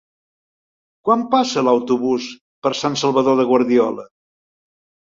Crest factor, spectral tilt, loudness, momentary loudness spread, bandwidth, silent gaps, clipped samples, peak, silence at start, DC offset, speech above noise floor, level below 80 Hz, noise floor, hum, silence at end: 18 dB; -5 dB/octave; -18 LUFS; 9 LU; 7.6 kHz; 2.41-2.62 s; under 0.1%; -2 dBFS; 1.05 s; under 0.1%; over 73 dB; -64 dBFS; under -90 dBFS; none; 1 s